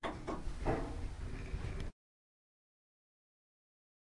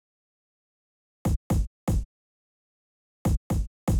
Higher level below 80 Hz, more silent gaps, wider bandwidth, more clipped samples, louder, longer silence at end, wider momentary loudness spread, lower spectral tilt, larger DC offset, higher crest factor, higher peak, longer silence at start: second, -46 dBFS vs -34 dBFS; second, none vs 1.36-1.50 s, 1.67-1.87 s, 2.05-3.25 s, 3.37-3.50 s, 3.67-3.87 s; second, 11.5 kHz vs over 20 kHz; neither; second, -43 LUFS vs -30 LUFS; first, 2.25 s vs 0 s; first, 8 LU vs 5 LU; about the same, -6.5 dB/octave vs -7.5 dB/octave; neither; first, 20 dB vs 14 dB; second, -24 dBFS vs -16 dBFS; second, 0 s vs 1.25 s